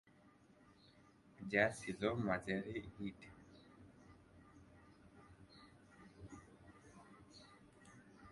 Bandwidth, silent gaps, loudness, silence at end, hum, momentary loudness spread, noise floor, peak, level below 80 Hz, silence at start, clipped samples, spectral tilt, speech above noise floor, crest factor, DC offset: 11.5 kHz; none; -41 LUFS; 0 s; none; 26 LU; -68 dBFS; -18 dBFS; -70 dBFS; 1.4 s; under 0.1%; -5.5 dB/octave; 27 dB; 30 dB; under 0.1%